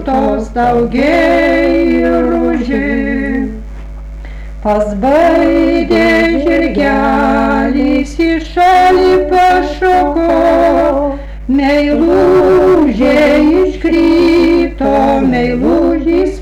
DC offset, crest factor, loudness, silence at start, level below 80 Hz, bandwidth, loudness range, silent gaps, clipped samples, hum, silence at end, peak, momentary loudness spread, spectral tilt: under 0.1%; 6 dB; -10 LUFS; 0 s; -26 dBFS; 11.5 kHz; 4 LU; none; under 0.1%; none; 0 s; -4 dBFS; 7 LU; -6.5 dB/octave